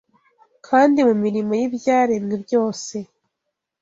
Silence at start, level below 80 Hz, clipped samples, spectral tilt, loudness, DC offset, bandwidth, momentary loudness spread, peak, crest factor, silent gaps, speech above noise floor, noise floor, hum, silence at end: 0.7 s; -64 dBFS; under 0.1%; -5.5 dB/octave; -19 LUFS; under 0.1%; 7.8 kHz; 12 LU; -2 dBFS; 18 dB; none; 61 dB; -79 dBFS; none; 0.75 s